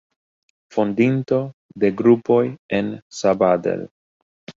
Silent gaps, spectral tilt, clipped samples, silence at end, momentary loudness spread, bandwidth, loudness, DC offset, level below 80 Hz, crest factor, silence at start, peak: 1.54-1.69 s, 2.59-2.69 s, 3.02-3.10 s, 3.91-4.47 s; -7 dB/octave; under 0.1%; 0.1 s; 12 LU; 7.8 kHz; -20 LUFS; under 0.1%; -60 dBFS; 18 dB; 0.75 s; -2 dBFS